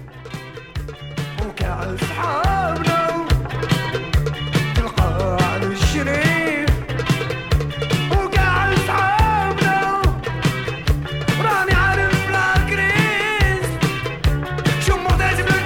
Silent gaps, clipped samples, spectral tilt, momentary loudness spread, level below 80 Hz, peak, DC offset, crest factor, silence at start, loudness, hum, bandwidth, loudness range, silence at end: none; under 0.1%; -5.5 dB/octave; 8 LU; -26 dBFS; -4 dBFS; under 0.1%; 16 dB; 0 s; -19 LUFS; none; 18.5 kHz; 3 LU; 0 s